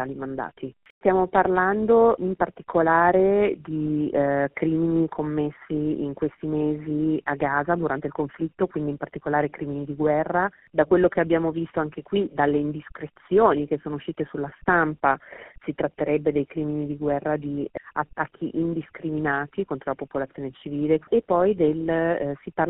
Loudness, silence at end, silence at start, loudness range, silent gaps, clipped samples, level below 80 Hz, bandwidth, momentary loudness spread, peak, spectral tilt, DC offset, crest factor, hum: -24 LUFS; 0 s; 0 s; 6 LU; 0.90-1.01 s; under 0.1%; -54 dBFS; 3.9 kHz; 11 LU; -4 dBFS; -3 dB/octave; under 0.1%; 20 dB; none